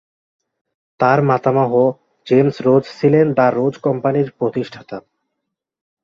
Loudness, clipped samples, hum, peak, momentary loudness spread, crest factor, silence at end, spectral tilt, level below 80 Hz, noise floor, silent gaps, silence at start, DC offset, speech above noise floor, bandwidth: -16 LUFS; under 0.1%; none; 0 dBFS; 14 LU; 16 dB; 1.05 s; -9 dB/octave; -60 dBFS; -78 dBFS; none; 1 s; under 0.1%; 63 dB; 7.4 kHz